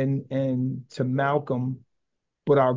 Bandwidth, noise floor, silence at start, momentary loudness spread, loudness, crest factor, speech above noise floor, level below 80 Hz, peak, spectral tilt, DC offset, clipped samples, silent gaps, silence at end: 7.6 kHz; -81 dBFS; 0 s; 9 LU; -26 LUFS; 16 dB; 57 dB; -66 dBFS; -8 dBFS; -9 dB/octave; under 0.1%; under 0.1%; none; 0 s